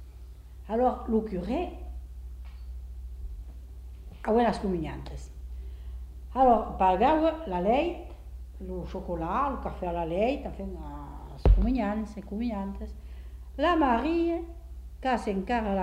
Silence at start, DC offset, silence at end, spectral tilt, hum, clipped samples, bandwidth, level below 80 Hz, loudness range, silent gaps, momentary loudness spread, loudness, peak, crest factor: 0 s; under 0.1%; 0 s; -7.5 dB/octave; 50 Hz at -65 dBFS; under 0.1%; 10 kHz; -36 dBFS; 6 LU; none; 21 LU; -28 LUFS; -10 dBFS; 20 dB